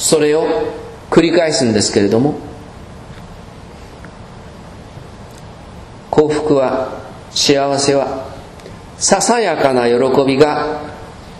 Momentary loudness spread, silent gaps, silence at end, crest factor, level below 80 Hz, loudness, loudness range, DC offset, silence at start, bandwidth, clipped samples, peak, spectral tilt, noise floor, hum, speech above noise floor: 23 LU; none; 0 s; 16 dB; -42 dBFS; -14 LUFS; 17 LU; under 0.1%; 0 s; 13 kHz; under 0.1%; 0 dBFS; -4 dB/octave; -34 dBFS; none; 21 dB